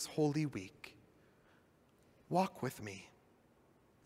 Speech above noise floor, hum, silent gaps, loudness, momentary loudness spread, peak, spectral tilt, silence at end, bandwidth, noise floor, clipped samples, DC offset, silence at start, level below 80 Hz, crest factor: 31 dB; none; none; -39 LUFS; 20 LU; -20 dBFS; -6 dB/octave; 1 s; 16 kHz; -69 dBFS; under 0.1%; under 0.1%; 0 s; -78 dBFS; 22 dB